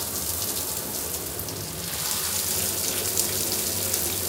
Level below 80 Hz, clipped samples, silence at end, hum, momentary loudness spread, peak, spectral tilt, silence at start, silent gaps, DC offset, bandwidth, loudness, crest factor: -52 dBFS; under 0.1%; 0 s; none; 6 LU; 0 dBFS; -1.5 dB/octave; 0 s; none; under 0.1%; 19 kHz; -25 LUFS; 28 dB